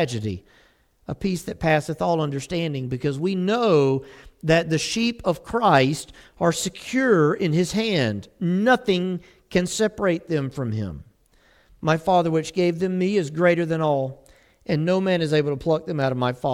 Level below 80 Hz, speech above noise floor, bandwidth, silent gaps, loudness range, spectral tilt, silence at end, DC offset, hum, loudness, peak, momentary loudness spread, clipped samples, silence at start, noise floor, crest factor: -50 dBFS; 36 dB; 16 kHz; none; 3 LU; -5.5 dB/octave; 0 s; under 0.1%; none; -22 LUFS; -4 dBFS; 10 LU; under 0.1%; 0 s; -58 dBFS; 20 dB